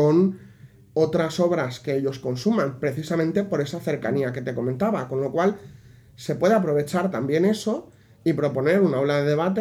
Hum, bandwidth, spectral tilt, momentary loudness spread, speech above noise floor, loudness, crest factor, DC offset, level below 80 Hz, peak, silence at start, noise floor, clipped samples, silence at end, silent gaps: none; 15 kHz; -7 dB/octave; 8 LU; 26 dB; -23 LUFS; 16 dB; under 0.1%; -62 dBFS; -6 dBFS; 0 s; -49 dBFS; under 0.1%; 0 s; none